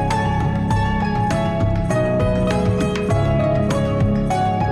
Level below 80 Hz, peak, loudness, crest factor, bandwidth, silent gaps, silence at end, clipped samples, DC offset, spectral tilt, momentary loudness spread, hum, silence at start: -30 dBFS; -10 dBFS; -19 LUFS; 8 dB; 12 kHz; none; 0 s; under 0.1%; under 0.1%; -7.5 dB/octave; 2 LU; none; 0 s